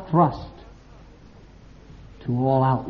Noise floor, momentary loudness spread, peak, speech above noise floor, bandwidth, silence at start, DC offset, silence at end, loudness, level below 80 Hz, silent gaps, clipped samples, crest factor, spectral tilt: -47 dBFS; 18 LU; -6 dBFS; 27 dB; 5.8 kHz; 0 s; under 0.1%; 0 s; -22 LUFS; -48 dBFS; none; under 0.1%; 18 dB; -8.5 dB/octave